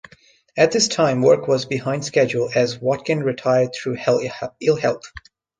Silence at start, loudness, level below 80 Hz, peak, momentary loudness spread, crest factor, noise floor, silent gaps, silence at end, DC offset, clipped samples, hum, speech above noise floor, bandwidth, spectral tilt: 0.55 s; -19 LUFS; -58 dBFS; -2 dBFS; 7 LU; 18 dB; -53 dBFS; none; 0.4 s; under 0.1%; under 0.1%; none; 34 dB; 9.8 kHz; -4.5 dB/octave